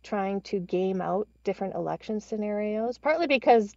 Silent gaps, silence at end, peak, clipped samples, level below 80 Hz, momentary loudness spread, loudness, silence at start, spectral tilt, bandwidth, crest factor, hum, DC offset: none; 0.05 s; -10 dBFS; under 0.1%; -62 dBFS; 10 LU; -28 LUFS; 0.05 s; -6.5 dB/octave; 7.8 kHz; 18 dB; none; under 0.1%